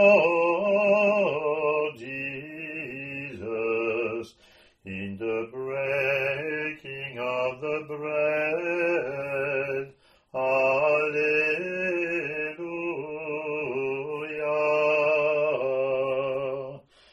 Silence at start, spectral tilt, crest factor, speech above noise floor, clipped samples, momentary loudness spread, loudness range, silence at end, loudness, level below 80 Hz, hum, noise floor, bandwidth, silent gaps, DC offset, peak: 0 s; -6.5 dB/octave; 20 dB; 36 dB; under 0.1%; 12 LU; 5 LU; 0.35 s; -26 LUFS; -68 dBFS; none; -58 dBFS; 12.5 kHz; none; under 0.1%; -6 dBFS